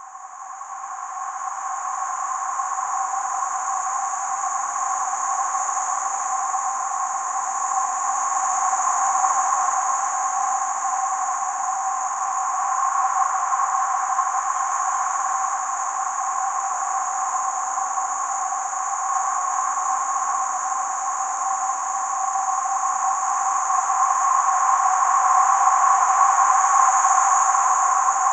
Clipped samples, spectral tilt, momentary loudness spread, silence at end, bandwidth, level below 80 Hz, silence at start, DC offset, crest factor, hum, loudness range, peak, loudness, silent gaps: under 0.1%; 2 dB/octave; 8 LU; 0 s; 9.6 kHz; -86 dBFS; 0 s; under 0.1%; 20 dB; none; 7 LU; -2 dBFS; -21 LUFS; none